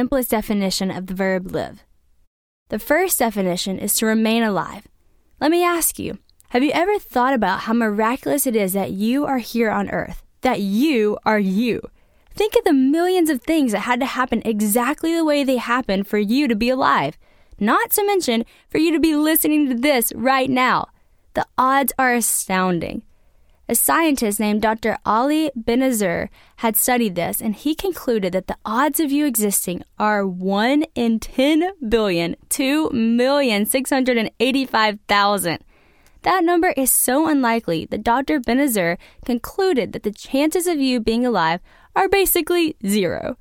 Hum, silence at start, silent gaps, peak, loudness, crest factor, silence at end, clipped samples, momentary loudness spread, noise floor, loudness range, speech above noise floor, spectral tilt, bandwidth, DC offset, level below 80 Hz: none; 0 s; 2.27-2.66 s; -4 dBFS; -19 LUFS; 16 dB; 0.05 s; under 0.1%; 8 LU; -56 dBFS; 2 LU; 37 dB; -4 dB/octave; 19 kHz; under 0.1%; -46 dBFS